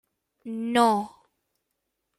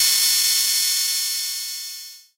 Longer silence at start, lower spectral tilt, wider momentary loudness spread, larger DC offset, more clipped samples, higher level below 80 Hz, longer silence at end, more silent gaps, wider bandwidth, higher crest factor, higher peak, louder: first, 0.45 s vs 0 s; first, -4.5 dB/octave vs 5 dB/octave; first, 19 LU vs 15 LU; neither; neither; about the same, -72 dBFS vs -68 dBFS; first, 1.1 s vs 0.15 s; neither; second, 14 kHz vs 16 kHz; about the same, 20 dB vs 16 dB; about the same, -8 dBFS vs -6 dBFS; second, -24 LUFS vs -18 LUFS